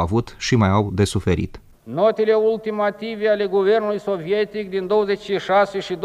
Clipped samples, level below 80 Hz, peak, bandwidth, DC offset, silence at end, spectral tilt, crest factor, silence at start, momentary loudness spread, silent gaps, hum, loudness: under 0.1%; -44 dBFS; -6 dBFS; 12.5 kHz; under 0.1%; 0 s; -6 dB/octave; 14 dB; 0 s; 6 LU; none; none; -20 LUFS